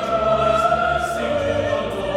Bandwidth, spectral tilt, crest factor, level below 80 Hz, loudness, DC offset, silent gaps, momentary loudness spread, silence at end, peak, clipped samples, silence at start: 14.5 kHz; -5 dB/octave; 14 dB; -38 dBFS; -19 LUFS; under 0.1%; none; 5 LU; 0 s; -6 dBFS; under 0.1%; 0 s